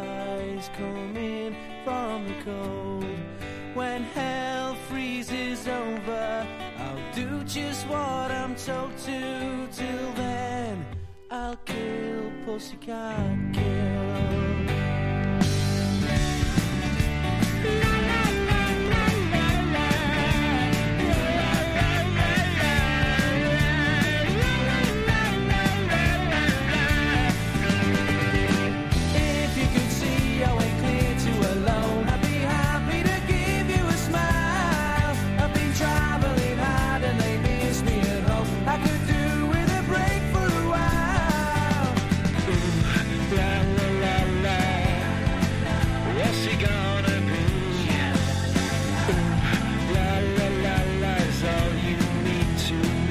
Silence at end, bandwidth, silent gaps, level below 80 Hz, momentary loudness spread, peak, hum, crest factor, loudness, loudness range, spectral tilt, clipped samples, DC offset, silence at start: 0 s; 16 kHz; none; -32 dBFS; 10 LU; -8 dBFS; none; 16 dB; -25 LUFS; 8 LU; -5.5 dB/octave; under 0.1%; under 0.1%; 0 s